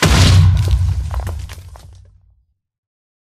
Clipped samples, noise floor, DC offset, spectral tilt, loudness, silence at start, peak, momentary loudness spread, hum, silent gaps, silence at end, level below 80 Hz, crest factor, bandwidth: under 0.1%; -58 dBFS; under 0.1%; -5 dB/octave; -14 LUFS; 0 s; 0 dBFS; 21 LU; none; none; 1.4 s; -22 dBFS; 16 dB; 14.5 kHz